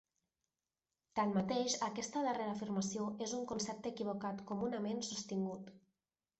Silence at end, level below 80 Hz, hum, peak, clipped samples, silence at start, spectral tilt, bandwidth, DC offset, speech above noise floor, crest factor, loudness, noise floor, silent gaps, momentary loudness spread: 0.6 s; -76 dBFS; none; -24 dBFS; under 0.1%; 1.15 s; -4.5 dB/octave; 8.2 kHz; under 0.1%; over 51 dB; 18 dB; -40 LUFS; under -90 dBFS; none; 7 LU